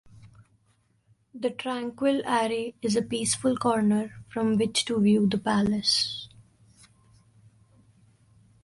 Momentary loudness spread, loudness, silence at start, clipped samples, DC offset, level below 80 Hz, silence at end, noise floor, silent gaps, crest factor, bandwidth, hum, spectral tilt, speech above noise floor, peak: 9 LU; -26 LUFS; 0.25 s; under 0.1%; under 0.1%; -60 dBFS; 2.35 s; -67 dBFS; none; 18 dB; 11.5 kHz; none; -4.5 dB/octave; 42 dB; -10 dBFS